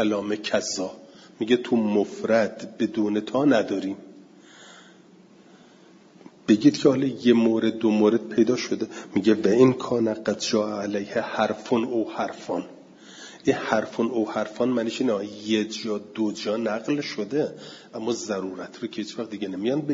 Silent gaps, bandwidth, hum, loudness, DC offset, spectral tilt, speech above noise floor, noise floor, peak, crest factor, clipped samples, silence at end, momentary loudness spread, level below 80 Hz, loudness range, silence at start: none; 7.8 kHz; none; -24 LUFS; under 0.1%; -5.5 dB/octave; 28 dB; -52 dBFS; -6 dBFS; 20 dB; under 0.1%; 0 s; 12 LU; -68 dBFS; 7 LU; 0 s